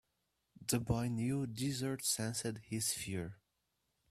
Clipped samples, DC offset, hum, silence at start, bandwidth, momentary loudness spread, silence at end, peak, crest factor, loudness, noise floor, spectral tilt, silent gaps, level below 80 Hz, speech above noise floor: under 0.1%; under 0.1%; none; 0.6 s; 15.5 kHz; 7 LU; 0.75 s; -20 dBFS; 20 dB; -38 LUFS; -84 dBFS; -4 dB/octave; none; -62 dBFS; 46 dB